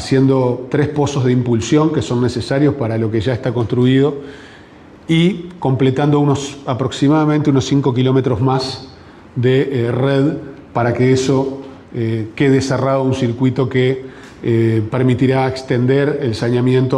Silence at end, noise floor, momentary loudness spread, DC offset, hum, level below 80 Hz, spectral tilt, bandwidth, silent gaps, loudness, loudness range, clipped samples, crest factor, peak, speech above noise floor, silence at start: 0 s; -40 dBFS; 8 LU; under 0.1%; none; -48 dBFS; -7 dB/octave; 10.5 kHz; none; -16 LUFS; 2 LU; under 0.1%; 12 dB; -4 dBFS; 25 dB; 0 s